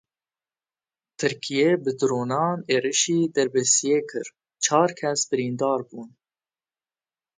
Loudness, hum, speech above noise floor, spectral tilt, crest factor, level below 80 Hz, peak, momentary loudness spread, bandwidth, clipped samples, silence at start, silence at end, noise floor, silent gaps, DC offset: -23 LUFS; none; over 67 dB; -3.5 dB/octave; 20 dB; -72 dBFS; -6 dBFS; 9 LU; 9.6 kHz; under 0.1%; 1.2 s; 1.3 s; under -90 dBFS; none; under 0.1%